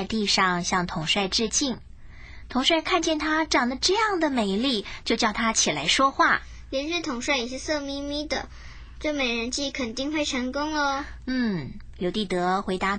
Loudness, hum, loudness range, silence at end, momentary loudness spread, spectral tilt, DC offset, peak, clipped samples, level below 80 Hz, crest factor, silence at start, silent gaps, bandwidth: -25 LUFS; none; 5 LU; 0 s; 10 LU; -3 dB/octave; under 0.1%; -8 dBFS; under 0.1%; -46 dBFS; 18 dB; 0 s; none; 9.8 kHz